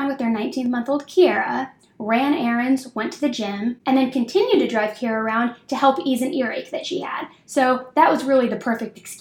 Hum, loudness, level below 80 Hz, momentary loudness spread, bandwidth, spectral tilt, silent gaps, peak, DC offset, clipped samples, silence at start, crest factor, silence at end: none; -21 LUFS; -68 dBFS; 10 LU; 16.5 kHz; -4.5 dB/octave; none; -2 dBFS; under 0.1%; under 0.1%; 0 s; 20 dB; 0.05 s